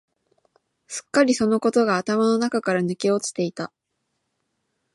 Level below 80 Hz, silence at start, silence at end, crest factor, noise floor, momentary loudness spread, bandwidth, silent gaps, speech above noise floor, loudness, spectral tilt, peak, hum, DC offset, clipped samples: -68 dBFS; 0.9 s; 1.3 s; 18 dB; -76 dBFS; 15 LU; 11.5 kHz; none; 55 dB; -21 LUFS; -4.5 dB/octave; -4 dBFS; none; under 0.1%; under 0.1%